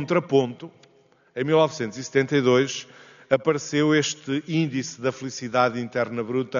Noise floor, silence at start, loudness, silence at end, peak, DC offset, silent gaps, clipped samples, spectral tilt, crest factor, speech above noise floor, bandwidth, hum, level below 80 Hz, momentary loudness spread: -59 dBFS; 0 s; -24 LUFS; 0 s; -4 dBFS; under 0.1%; none; under 0.1%; -4.5 dB/octave; 20 dB; 36 dB; 7.4 kHz; none; -68 dBFS; 10 LU